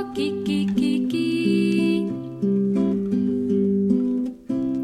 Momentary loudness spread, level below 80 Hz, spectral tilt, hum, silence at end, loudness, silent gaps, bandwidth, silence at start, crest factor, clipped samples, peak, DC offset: 6 LU; -54 dBFS; -7.5 dB/octave; none; 0 s; -22 LUFS; none; 11 kHz; 0 s; 14 dB; under 0.1%; -8 dBFS; under 0.1%